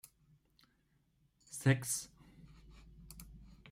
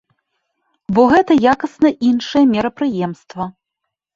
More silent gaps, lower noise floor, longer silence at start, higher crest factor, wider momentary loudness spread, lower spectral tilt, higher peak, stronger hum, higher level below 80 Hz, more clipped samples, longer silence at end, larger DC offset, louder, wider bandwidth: neither; second, -75 dBFS vs -79 dBFS; first, 1.5 s vs 0.9 s; first, 24 dB vs 16 dB; first, 26 LU vs 16 LU; second, -4.5 dB/octave vs -6.5 dB/octave; second, -18 dBFS vs 0 dBFS; neither; second, -64 dBFS vs -52 dBFS; neither; second, 0.25 s vs 0.65 s; neither; second, -36 LUFS vs -15 LUFS; first, 16 kHz vs 7.6 kHz